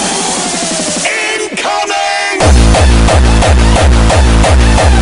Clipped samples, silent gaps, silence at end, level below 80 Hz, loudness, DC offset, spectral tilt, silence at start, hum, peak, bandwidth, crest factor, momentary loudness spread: under 0.1%; none; 0 s; -10 dBFS; -9 LUFS; under 0.1%; -4.5 dB/octave; 0 s; none; 0 dBFS; 11 kHz; 8 dB; 5 LU